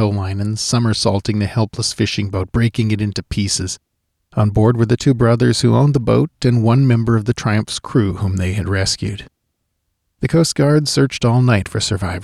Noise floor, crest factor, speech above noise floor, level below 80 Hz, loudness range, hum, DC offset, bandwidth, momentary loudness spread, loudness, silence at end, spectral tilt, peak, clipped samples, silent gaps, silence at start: -71 dBFS; 12 dB; 56 dB; -40 dBFS; 5 LU; none; under 0.1%; 12.5 kHz; 7 LU; -16 LUFS; 0 s; -5.5 dB/octave; -4 dBFS; under 0.1%; none; 0 s